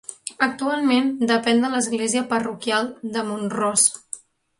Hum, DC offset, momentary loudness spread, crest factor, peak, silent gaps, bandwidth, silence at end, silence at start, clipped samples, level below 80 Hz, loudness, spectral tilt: none; under 0.1%; 10 LU; 18 dB; -4 dBFS; none; 11.5 kHz; 0.4 s; 0.1 s; under 0.1%; -66 dBFS; -21 LUFS; -2.5 dB/octave